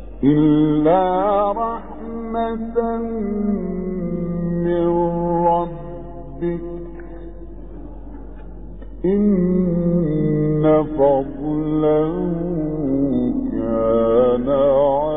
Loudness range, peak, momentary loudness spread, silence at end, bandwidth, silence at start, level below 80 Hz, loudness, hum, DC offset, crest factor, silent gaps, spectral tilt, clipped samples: 7 LU; -4 dBFS; 21 LU; 0 s; 3.9 kHz; 0 s; -38 dBFS; -19 LUFS; none; 1%; 16 dB; none; -13 dB/octave; under 0.1%